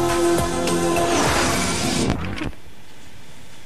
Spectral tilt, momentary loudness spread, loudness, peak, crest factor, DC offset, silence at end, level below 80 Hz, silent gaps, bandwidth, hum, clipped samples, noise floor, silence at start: -4 dB/octave; 9 LU; -20 LUFS; -2 dBFS; 20 dB; 3%; 0.05 s; -36 dBFS; none; 15 kHz; none; under 0.1%; -45 dBFS; 0 s